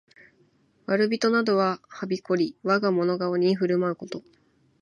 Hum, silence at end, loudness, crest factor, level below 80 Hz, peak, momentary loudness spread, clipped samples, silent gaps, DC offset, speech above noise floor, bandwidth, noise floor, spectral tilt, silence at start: none; 0.6 s; -25 LUFS; 18 dB; -74 dBFS; -8 dBFS; 12 LU; under 0.1%; none; under 0.1%; 39 dB; 10.5 kHz; -63 dBFS; -6.5 dB/octave; 0.9 s